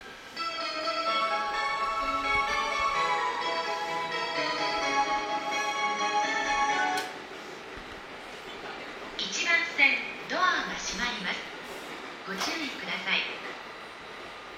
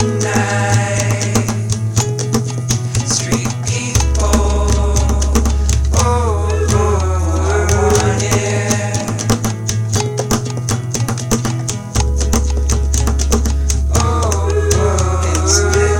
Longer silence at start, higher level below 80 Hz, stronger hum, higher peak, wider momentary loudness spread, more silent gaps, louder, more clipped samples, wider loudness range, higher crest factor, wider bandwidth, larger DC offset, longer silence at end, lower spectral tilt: about the same, 0 s vs 0 s; second, -58 dBFS vs -20 dBFS; neither; second, -8 dBFS vs 0 dBFS; first, 15 LU vs 4 LU; neither; second, -28 LUFS vs -15 LUFS; neither; about the same, 4 LU vs 3 LU; first, 22 dB vs 14 dB; about the same, 17 kHz vs 17 kHz; neither; about the same, 0 s vs 0 s; second, -1.5 dB/octave vs -4.5 dB/octave